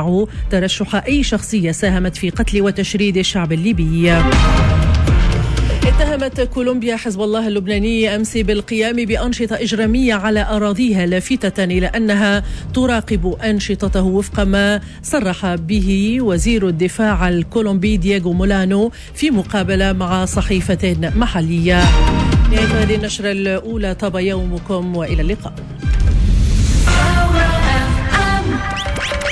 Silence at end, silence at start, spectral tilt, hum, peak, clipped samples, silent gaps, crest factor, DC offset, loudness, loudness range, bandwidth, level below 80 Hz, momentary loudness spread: 0 s; 0 s; -5.5 dB/octave; none; -4 dBFS; under 0.1%; none; 12 dB; under 0.1%; -16 LUFS; 3 LU; 11 kHz; -20 dBFS; 6 LU